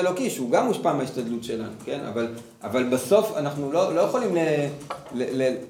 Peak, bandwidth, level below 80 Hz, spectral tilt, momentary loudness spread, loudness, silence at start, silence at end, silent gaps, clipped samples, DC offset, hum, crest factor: -6 dBFS; 18 kHz; -68 dBFS; -5.5 dB/octave; 11 LU; -25 LUFS; 0 s; 0 s; none; under 0.1%; under 0.1%; none; 18 dB